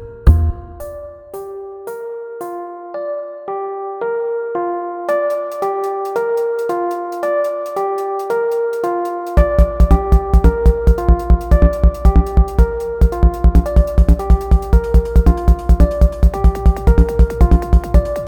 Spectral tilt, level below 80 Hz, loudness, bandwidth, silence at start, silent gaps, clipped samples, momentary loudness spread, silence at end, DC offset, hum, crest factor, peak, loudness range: -9 dB/octave; -14 dBFS; -16 LUFS; 14.5 kHz; 0 s; none; under 0.1%; 14 LU; 0 s; under 0.1%; none; 14 dB; 0 dBFS; 9 LU